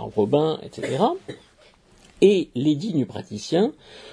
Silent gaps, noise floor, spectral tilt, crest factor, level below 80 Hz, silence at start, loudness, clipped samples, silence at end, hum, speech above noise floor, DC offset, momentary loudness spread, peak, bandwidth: none; -55 dBFS; -6.5 dB/octave; 20 dB; -60 dBFS; 0 s; -22 LUFS; under 0.1%; 0 s; none; 32 dB; under 0.1%; 15 LU; -4 dBFS; 10.5 kHz